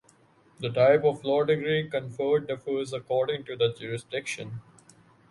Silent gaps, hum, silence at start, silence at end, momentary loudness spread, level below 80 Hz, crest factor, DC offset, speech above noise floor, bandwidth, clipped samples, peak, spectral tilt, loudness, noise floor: none; none; 0.6 s; 0.7 s; 14 LU; -68 dBFS; 18 dB; under 0.1%; 34 dB; 11.5 kHz; under 0.1%; -8 dBFS; -5.5 dB/octave; -27 LUFS; -61 dBFS